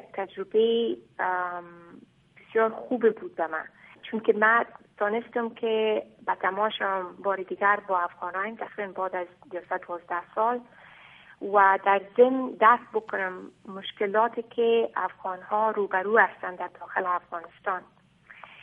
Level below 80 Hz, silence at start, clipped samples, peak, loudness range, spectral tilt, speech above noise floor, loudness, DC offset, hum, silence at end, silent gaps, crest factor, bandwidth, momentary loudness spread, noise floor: -76 dBFS; 0.05 s; under 0.1%; -6 dBFS; 6 LU; -7 dB/octave; 25 dB; -26 LUFS; under 0.1%; none; 0.15 s; none; 22 dB; 3.8 kHz; 14 LU; -52 dBFS